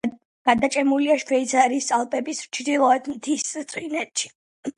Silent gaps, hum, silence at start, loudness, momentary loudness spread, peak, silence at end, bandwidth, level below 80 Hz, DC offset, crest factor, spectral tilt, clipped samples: 0.25-0.45 s, 4.35-4.63 s; none; 0.05 s; -22 LUFS; 9 LU; -4 dBFS; 0.05 s; 11.5 kHz; -64 dBFS; under 0.1%; 18 dB; -2.5 dB/octave; under 0.1%